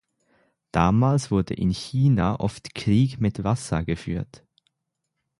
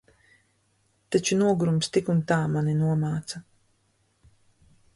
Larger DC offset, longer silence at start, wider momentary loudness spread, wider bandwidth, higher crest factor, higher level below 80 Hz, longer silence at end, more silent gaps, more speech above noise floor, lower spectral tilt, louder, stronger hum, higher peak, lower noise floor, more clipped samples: neither; second, 0.75 s vs 1.1 s; about the same, 9 LU vs 9 LU; about the same, 11.5 kHz vs 11.5 kHz; about the same, 20 dB vs 18 dB; first, -42 dBFS vs -60 dBFS; second, 1.15 s vs 1.55 s; neither; first, 58 dB vs 45 dB; about the same, -7 dB/octave vs -6 dB/octave; about the same, -24 LUFS vs -25 LUFS; neither; first, -4 dBFS vs -8 dBFS; first, -80 dBFS vs -69 dBFS; neither